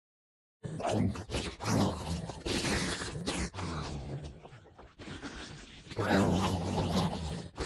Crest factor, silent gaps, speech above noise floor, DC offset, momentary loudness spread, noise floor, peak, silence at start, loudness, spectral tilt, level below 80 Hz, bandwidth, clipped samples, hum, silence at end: 20 dB; none; 23 dB; under 0.1%; 17 LU; -54 dBFS; -16 dBFS; 0.65 s; -34 LUFS; -5 dB/octave; -48 dBFS; 13 kHz; under 0.1%; none; 0 s